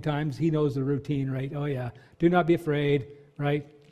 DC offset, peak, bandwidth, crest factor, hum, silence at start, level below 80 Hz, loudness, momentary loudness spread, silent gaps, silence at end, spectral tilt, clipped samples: under 0.1%; -8 dBFS; 13 kHz; 18 dB; none; 0 s; -58 dBFS; -27 LUFS; 9 LU; none; 0.25 s; -8.5 dB/octave; under 0.1%